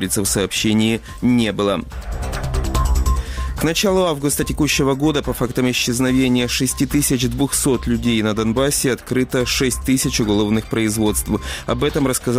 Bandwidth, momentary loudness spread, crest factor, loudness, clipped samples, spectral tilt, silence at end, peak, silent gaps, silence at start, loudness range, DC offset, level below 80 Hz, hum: 16 kHz; 5 LU; 12 dB; -18 LUFS; under 0.1%; -4.5 dB/octave; 0 s; -6 dBFS; none; 0 s; 2 LU; under 0.1%; -28 dBFS; none